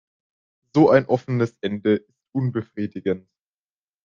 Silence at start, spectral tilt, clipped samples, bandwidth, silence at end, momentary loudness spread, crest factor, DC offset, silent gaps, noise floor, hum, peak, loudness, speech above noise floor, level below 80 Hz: 0.75 s; -8.5 dB/octave; under 0.1%; 7.2 kHz; 0.85 s; 13 LU; 22 dB; under 0.1%; none; under -90 dBFS; none; -2 dBFS; -22 LUFS; over 69 dB; -66 dBFS